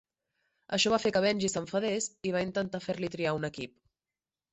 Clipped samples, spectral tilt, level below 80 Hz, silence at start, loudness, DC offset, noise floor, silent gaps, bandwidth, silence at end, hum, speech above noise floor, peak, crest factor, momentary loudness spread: under 0.1%; -4 dB/octave; -64 dBFS; 0.7 s; -31 LUFS; under 0.1%; under -90 dBFS; none; 8.4 kHz; 0.85 s; none; over 59 dB; -14 dBFS; 18 dB; 9 LU